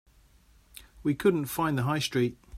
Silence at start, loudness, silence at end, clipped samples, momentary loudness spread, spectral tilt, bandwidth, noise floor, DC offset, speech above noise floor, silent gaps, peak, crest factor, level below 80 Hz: 0.8 s; -28 LUFS; 0 s; under 0.1%; 5 LU; -5.5 dB/octave; 16 kHz; -60 dBFS; under 0.1%; 32 dB; none; -10 dBFS; 18 dB; -58 dBFS